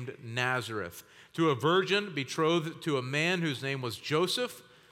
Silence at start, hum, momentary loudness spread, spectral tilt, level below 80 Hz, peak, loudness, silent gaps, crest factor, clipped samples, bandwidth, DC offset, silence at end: 0 s; none; 11 LU; -5 dB/octave; -78 dBFS; -12 dBFS; -30 LUFS; none; 18 dB; under 0.1%; 17 kHz; under 0.1%; 0.3 s